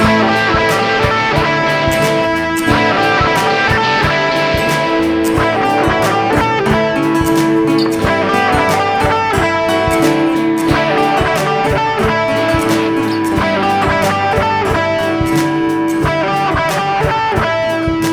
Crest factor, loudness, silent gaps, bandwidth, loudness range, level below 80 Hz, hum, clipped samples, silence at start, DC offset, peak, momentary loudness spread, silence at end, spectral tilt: 12 dB; -13 LUFS; none; 19 kHz; 2 LU; -32 dBFS; none; under 0.1%; 0 s; under 0.1%; 0 dBFS; 3 LU; 0 s; -5 dB/octave